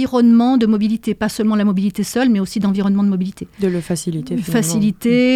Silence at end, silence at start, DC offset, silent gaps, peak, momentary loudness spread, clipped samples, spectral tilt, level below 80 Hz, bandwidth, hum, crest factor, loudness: 0 s; 0 s; under 0.1%; none; -4 dBFS; 9 LU; under 0.1%; -6 dB/octave; -50 dBFS; 15 kHz; none; 12 dB; -17 LUFS